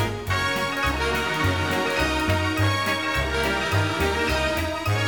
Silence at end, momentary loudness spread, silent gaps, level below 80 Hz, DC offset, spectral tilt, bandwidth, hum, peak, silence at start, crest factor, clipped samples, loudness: 0 s; 2 LU; none; -36 dBFS; 0.3%; -4.5 dB/octave; over 20 kHz; none; -8 dBFS; 0 s; 14 dB; under 0.1%; -23 LUFS